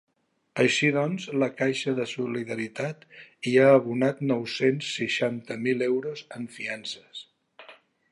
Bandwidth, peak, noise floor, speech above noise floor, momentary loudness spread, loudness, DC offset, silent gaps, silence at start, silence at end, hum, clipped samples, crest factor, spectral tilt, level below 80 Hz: 11.5 kHz; -6 dBFS; -53 dBFS; 27 dB; 16 LU; -26 LUFS; under 0.1%; none; 0.55 s; 0.4 s; none; under 0.1%; 20 dB; -5 dB/octave; -76 dBFS